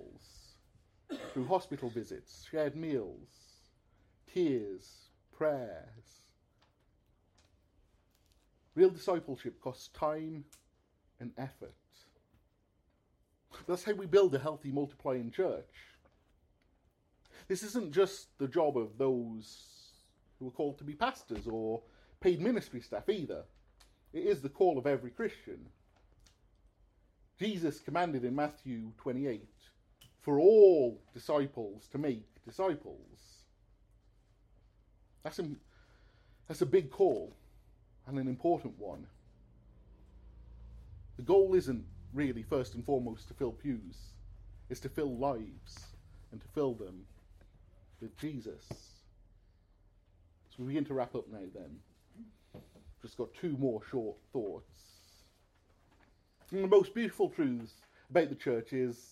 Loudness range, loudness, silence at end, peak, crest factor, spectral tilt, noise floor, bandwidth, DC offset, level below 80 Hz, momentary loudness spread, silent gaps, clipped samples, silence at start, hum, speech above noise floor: 13 LU; -34 LUFS; 0.1 s; -12 dBFS; 24 dB; -6.5 dB/octave; -74 dBFS; 13.5 kHz; under 0.1%; -62 dBFS; 22 LU; none; under 0.1%; 0 s; none; 40 dB